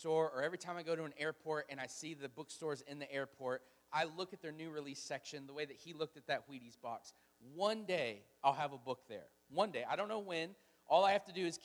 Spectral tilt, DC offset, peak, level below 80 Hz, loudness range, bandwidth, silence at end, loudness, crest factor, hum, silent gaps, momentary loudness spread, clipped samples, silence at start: -4 dB/octave; under 0.1%; -20 dBFS; -86 dBFS; 6 LU; over 20 kHz; 0 s; -41 LUFS; 22 dB; none; none; 12 LU; under 0.1%; 0 s